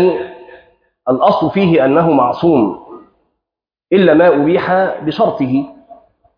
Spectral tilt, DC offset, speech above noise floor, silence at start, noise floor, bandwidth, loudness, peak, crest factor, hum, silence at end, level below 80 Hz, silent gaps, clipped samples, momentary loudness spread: -9.5 dB/octave; under 0.1%; 72 dB; 0 s; -84 dBFS; 5.2 kHz; -13 LUFS; 0 dBFS; 12 dB; none; 0.45 s; -52 dBFS; none; under 0.1%; 11 LU